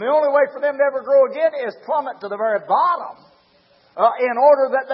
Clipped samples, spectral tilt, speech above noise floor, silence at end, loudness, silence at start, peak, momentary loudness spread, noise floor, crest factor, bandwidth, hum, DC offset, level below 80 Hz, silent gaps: under 0.1%; -8.5 dB/octave; 38 dB; 0 s; -18 LUFS; 0 s; -2 dBFS; 11 LU; -56 dBFS; 16 dB; 5.6 kHz; none; under 0.1%; -78 dBFS; none